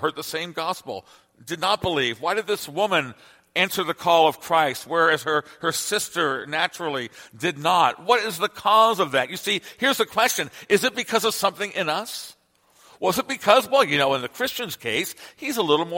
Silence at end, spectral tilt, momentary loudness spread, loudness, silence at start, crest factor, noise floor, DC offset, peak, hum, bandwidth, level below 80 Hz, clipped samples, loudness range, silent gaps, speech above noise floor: 0 s; -2.5 dB/octave; 10 LU; -22 LUFS; 0 s; 22 dB; -59 dBFS; under 0.1%; 0 dBFS; none; 17 kHz; -62 dBFS; under 0.1%; 3 LU; none; 36 dB